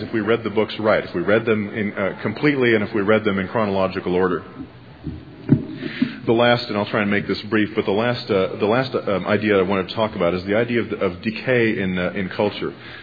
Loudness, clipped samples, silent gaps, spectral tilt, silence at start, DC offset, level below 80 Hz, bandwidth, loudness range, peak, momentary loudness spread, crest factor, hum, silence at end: -20 LUFS; under 0.1%; none; -8.5 dB/octave; 0 s; 0.1%; -52 dBFS; 5 kHz; 2 LU; -2 dBFS; 7 LU; 18 dB; none; 0 s